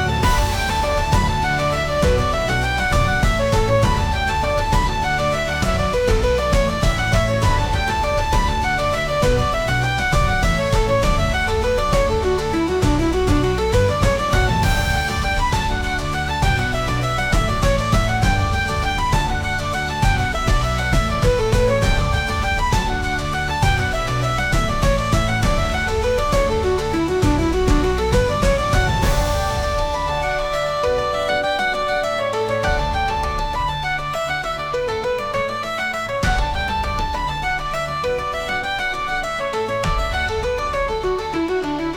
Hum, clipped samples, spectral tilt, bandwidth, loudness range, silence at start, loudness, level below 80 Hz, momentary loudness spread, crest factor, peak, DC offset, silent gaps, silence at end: none; under 0.1%; -5 dB/octave; 18.5 kHz; 3 LU; 0 s; -19 LUFS; -24 dBFS; 4 LU; 14 dB; -4 dBFS; 0.1%; none; 0 s